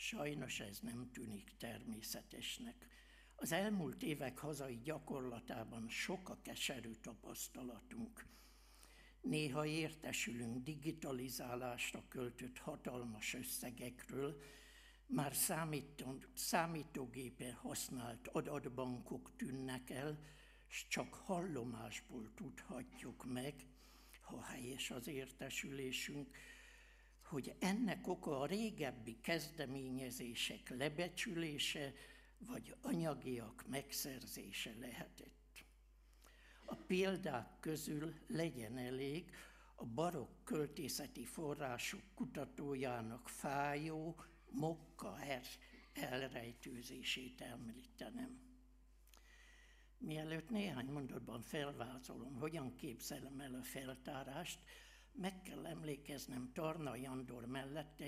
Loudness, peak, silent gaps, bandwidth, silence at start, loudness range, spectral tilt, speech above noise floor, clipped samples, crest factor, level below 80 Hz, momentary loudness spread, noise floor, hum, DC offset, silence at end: -46 LUFS; -22 dBFS; none; 15.5 kHz; 0 s; 6 LU; -4 dB/octave; 21 dB; under 0.1%; 24 dB; -68 dBFS; 15 LU; -67 dBFS; none; under 0.1%; 0 s